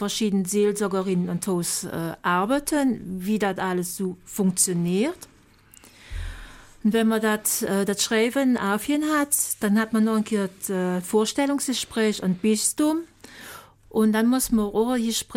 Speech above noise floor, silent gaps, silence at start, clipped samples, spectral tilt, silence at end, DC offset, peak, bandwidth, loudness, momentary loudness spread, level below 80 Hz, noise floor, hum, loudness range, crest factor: 30 dB; none; 0 s; under 0.1%; -4 dB/octave; 0 s; under 0.1%; -8 dBFS; 17 kHz; -23 LUFS; 9 LU; -48 dBFS; -53 dBFS; none; 4 LU; 16 dB